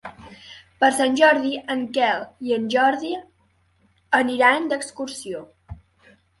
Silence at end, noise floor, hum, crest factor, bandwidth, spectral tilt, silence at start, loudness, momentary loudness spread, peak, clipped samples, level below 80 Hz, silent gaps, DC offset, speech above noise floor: 0.65 s; -63 dBFS; none; 20 dB; 11.5 kHz; -3 dB/octave; 0.05 s; -21 LUFS; 17 LU; -4 dBFS; under 0.1%; -56 dBFS; none; under 0.1%; 42 dB